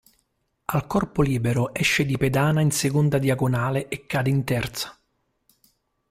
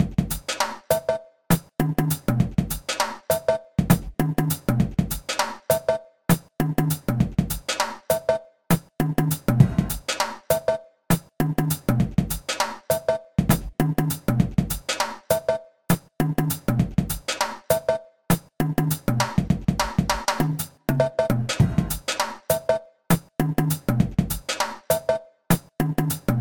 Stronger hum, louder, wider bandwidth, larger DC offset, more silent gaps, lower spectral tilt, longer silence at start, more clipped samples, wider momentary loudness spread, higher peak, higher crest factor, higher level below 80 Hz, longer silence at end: neither; about the same, -23 LUFS vs -24 LUFS; second, 16 kHz vs 19.5 kHz; neither; neither; about the same, -5.5 dB/octave vs -5.5 dB/octave; first, 0.7 s vs 0 s; neither; first, 7 LU vs 4 LU; second, -8 dBFS vs 0 dBFS; second, 16 dB vs 22 dB; second, -48 dBFS vs -40 dBFS; first, 1.2 s vs 0 s